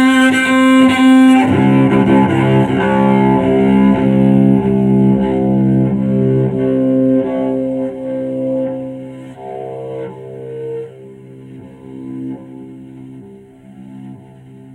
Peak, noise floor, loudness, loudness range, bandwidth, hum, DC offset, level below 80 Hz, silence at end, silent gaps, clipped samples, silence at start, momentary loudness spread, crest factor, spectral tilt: 0 dBFS; -38 dBFS; -12 LUFS; 19 LU; 12 kHz; none; under 0.1%; -42 dBFS; 0.05 s; none; under 0.1%; 0 s; 21 LU; 14 dB; -7.5 dB/octave